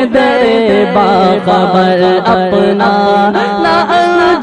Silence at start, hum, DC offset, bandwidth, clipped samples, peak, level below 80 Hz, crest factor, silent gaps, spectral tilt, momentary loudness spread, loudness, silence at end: 0 s; none; under 0.1%; 10 kHz; under 0.1%; 0 dBFS; -42 dBFS; 8 dB; none; -6.5 dB/octave; 2 LU; -9 LUFS; 0 s